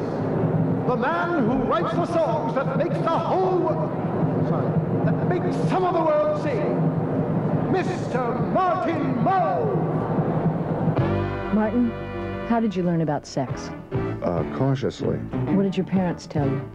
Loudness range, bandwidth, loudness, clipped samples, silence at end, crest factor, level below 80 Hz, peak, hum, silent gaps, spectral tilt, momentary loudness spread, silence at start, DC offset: 3 LU; 8.4 kHz; -23 LUFS; under 0.1%; 0 s; 12 dB; -48 dBFS; -10 dBFS; none; none; -8.5 dB/octave; 4 LU; 0 s; under 0.1%